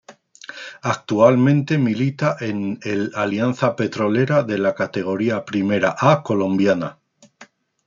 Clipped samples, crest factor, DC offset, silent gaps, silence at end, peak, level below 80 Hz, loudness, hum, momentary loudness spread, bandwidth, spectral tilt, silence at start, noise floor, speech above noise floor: under 0.1%; 18 dB; under 0.1%; none; 0.45 s; -2 dBFS; -64 dBFS; -19 LUFS; none; 9 LU; 7.6 kHz; -7 dB/octave; 0.1 s; -49 dBFS; 30 dB